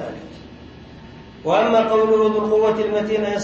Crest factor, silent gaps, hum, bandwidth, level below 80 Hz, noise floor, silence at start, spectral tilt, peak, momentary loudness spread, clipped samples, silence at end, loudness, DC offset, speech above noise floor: 16 dB; none; none; 7.4 kHz; -50 dBFS; -40 dBFS; 0 s; -5.5 dB/octave; -4 dBFS; 19 LU; under 0.1%; 0 s; -18 LUFS; under 0.1%; 23 dB